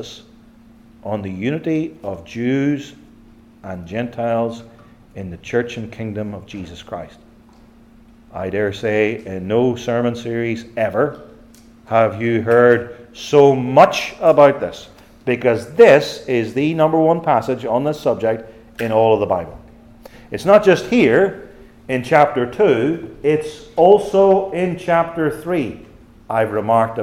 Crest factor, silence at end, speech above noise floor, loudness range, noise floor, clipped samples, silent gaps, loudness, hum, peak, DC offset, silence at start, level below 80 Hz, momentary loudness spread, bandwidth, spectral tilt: 18 dB; 0 s; 30 dB; 11 LU; -46 dBFS; under 0.1%; none; -17 LUFS; none; 0 dBFS; under 0.1%; 0 s; -50 dBFS; 19 LU; 15 kHz; -6.5 dB/octave